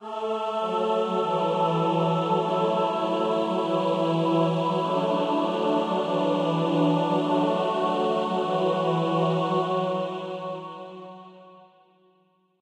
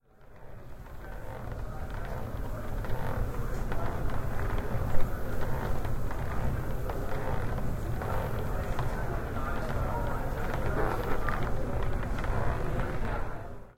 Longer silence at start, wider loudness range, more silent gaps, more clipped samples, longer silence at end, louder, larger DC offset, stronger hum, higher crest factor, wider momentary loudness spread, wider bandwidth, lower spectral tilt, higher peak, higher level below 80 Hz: second, 0 s vs 0.2 s; about the same, 3 LU vs 4 LU; neither; neither; first, 1 s vs 0.05 s; first, -25 LUFS vs -35 LUFS; neither; neither; about the same, 14 dB vs 18 dB; about the same, 7 LU vs 8 LU; second, 10.5 kHz vs 16 kHz; about the same, -7.5 dB/octave vs -7 dB/octave; about the same, -10 dBFS vs -10 dBFS; second, -84 dBFS vs -34 dBFS